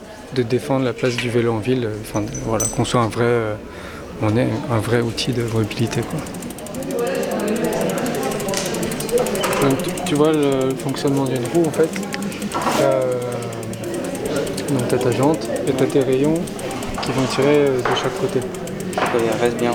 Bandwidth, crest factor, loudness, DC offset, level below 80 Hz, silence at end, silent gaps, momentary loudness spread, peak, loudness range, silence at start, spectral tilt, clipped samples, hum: over 20 kHz; 18 dB; -20 LUFS; under 0.1%; -44 dBFS; 0 s; none; 9 LU; -2 dBFS; 3 LU; 0 s; -5 dB/octave; under 0.1%; none